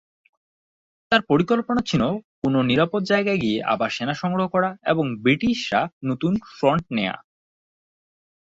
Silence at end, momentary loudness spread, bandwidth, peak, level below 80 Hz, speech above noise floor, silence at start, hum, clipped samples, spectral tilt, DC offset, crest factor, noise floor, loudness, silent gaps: 1.35 s; 6 LU; 7.8 kHz; -4 dBFS; -54 dBFS; over 69 dB; 1.1 s; none; under 0.1%; -6.5 dB/octave; under 0.1%; 18 dB; under -90 dBFS; -22 LUFS; 2.24-2.42 s, 5.93-6.01 s